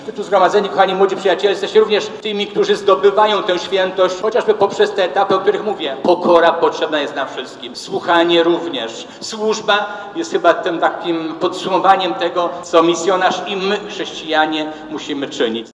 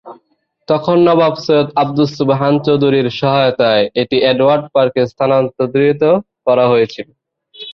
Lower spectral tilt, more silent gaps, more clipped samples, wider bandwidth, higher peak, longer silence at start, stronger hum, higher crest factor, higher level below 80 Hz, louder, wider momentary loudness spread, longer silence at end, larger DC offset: second, -4 dB/octave vs -7.5 dB/octave; neither; neither; first, 10.5 kHz vs 6.6 kHz; about the same, 0 dBFS vs -2 dBFS; about the same, 0 s vs 0.05 s; neither; about the same, 16 dB vs 12 dB; second, -60 dBFS vs -54 dBFS; second, -16 LUFS vs -13 LUFS; first, 11 LU vs 5 LU; about the same, 0.05 s vs 0 s; neither